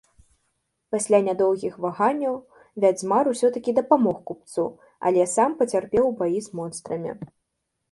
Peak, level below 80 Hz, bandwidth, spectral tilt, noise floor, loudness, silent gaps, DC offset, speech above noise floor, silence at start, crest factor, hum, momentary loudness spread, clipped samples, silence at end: -4 dBFS; -62 dBFS; 11.5 kHz; -5.5 dB/octave; -78 dBFS; -23 LUFS; none; under 0.1%; 56 dB; 0.9 s; 18 dB; none; 12 LU; under 0.1%; 0.65 s